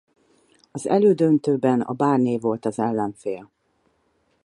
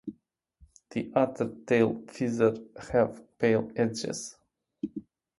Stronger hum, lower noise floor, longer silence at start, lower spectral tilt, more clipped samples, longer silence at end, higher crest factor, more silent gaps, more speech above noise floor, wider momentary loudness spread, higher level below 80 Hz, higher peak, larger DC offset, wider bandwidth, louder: neither; about the same, -67 dBFS vs -68 dBFS; first, 0.75 s vs 0.05 s; first, -7.5 dB/octave vs -6 dB/octave; neither; first, 1 s vs 0.4 s; about the same, 18 dB vs 20 dB; neither; first, 46 dB vs 40 dB; about the same, 14 LU vs 14 LU; second, -68 dBFS vs -62 dBFS; first, -4 dBFS vs -10 dBFS; neither; about the same, 11.5 kHz vs 11.5 kHz; first, -21 LUFS vs -29 LUFS